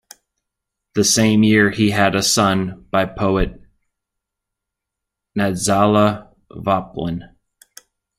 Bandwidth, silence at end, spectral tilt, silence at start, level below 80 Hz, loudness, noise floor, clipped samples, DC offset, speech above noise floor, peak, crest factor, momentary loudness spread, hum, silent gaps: 15.5 kHz; 0.95 s; -4 dB/octave; 0.95 s; -38 dBFS; -17 LUFS; -82 dBFS; under 0.1%; under 0.1%; 66 dB; -2 dBFS; 18 dB; 13 LU; none; none